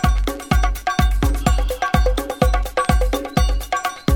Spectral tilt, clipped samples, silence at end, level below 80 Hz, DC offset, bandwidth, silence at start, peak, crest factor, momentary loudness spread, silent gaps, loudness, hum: -5.5 dB/octave; under 0.1%; 0 s; -20 dBFS; under 0.1%; 18 kHz; 0 s; 0 dBFS; 18 dB; 3 LU; none; -20 LUFS; none